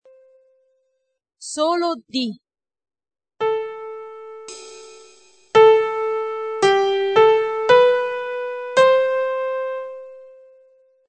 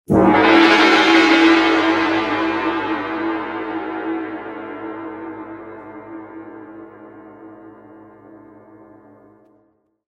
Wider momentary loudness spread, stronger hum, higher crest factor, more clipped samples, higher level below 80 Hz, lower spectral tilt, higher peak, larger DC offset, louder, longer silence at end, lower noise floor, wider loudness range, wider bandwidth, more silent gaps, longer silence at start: about the same, 22 LU vs 24 LU; neither; about the same, 18 dB vs 18 dB; neither; second, -66 dBFS vs -50 dBFS; second, -3.5 dB/octave vs -5 dB/octave; about the same, -2 dBFS vs 0 dBFS; neither; second, -18 LUFS vs -15 LUFS; second, 0.8 s vs 2.45 s; first, -74 dBFS vs -61 dBFS; second, 11 LU vs 25 LU; about the same, 9.2 kHz vs 9 kHz; neither; first, 1.4 s vs 0.1 s